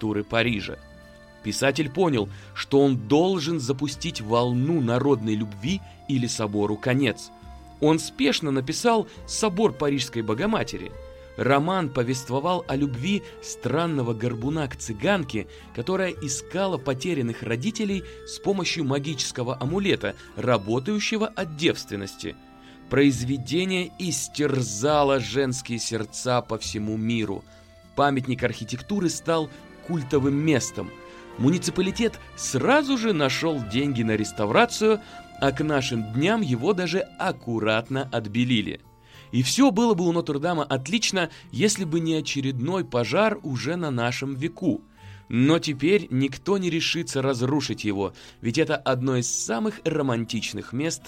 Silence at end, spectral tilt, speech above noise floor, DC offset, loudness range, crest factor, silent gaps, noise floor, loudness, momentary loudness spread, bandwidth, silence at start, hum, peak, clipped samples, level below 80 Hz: 0 s; -5 dB/octave; 23 dB; under 0.1%; 3 LU; 20 dB; none; -48 dBFS; -25 LUFS; 9 LU; 16 kHz; 0 s; none; -4 dBFS; under 0.1%; -52 dBFS